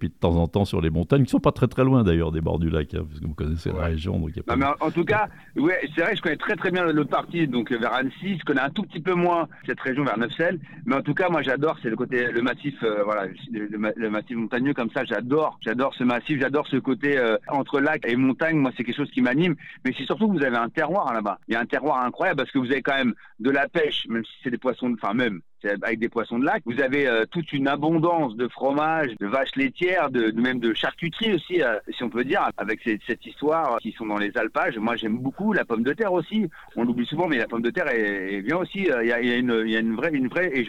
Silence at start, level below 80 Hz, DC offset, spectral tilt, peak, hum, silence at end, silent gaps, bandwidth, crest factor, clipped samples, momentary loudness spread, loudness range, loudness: 0 s; -48 dBFS; under 0.1%; -7.5 dB/octave; -4 dBFS; none; 0 s; none; 11 kHz; 18 dB; under 0.1%; 6 LU; 2 LU; -24 LUFS